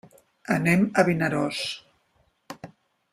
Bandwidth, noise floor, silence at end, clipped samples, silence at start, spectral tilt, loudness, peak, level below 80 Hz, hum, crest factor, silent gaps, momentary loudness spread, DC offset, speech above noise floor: 15 kHz; -67 dBFS; 0.45 s; under 0.1%; 0.5 s; -5.5 dB/octave; -24 LUFS; -4 dBFS; -62 dBFS; none; 22 dB; none; 22 LU; under 0.1%; 45 dB